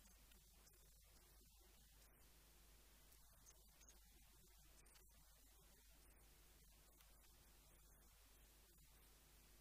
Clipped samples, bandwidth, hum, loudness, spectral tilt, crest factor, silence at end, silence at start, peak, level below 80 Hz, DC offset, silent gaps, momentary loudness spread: under 0.1%; 15.5 kHz; none; -69 LUFS; -2.5 dB/octave; 18 dB; 0 s; 0 s; -52 dBFS; -72 dBFS; under 0.1%; none; 2 LU